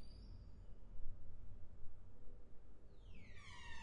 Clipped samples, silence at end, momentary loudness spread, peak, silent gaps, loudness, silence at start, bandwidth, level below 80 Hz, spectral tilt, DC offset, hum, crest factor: under 0.1%; 0 s; 8 LU; -30 dBFS; none; -62 LUFS; 0 s; 7.2 kHz; -56 dBFS; -5 dB/octave; under 0.1%; none; 16 dB